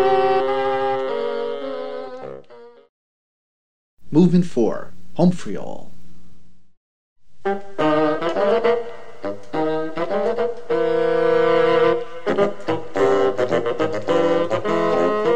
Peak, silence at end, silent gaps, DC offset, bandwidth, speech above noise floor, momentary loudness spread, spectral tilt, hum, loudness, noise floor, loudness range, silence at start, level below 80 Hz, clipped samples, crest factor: -4 dBFS; 0 s; 2.89-3.97 s, 6.77-7.16 s; 4%; 9.2 kHz; 26 dB; 15 LU; -7 dB/octave; none; -20 LUFS; -44 dBFS; 7 LU; 0 s; -58 dBFS; under 0.1%; 18 dB